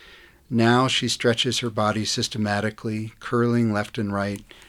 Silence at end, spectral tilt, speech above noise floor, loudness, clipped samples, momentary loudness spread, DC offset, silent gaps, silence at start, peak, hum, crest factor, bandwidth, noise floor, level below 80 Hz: 0.25 s; -4.5 dB/octave; 27 dB; -23 LUFS; under 0.1%; 8 LU; under 0.1%; none; 0.1 s; -4 dBFS; none; 18 dB; 14.5 kHz; -50 dBFS; -56 dBFS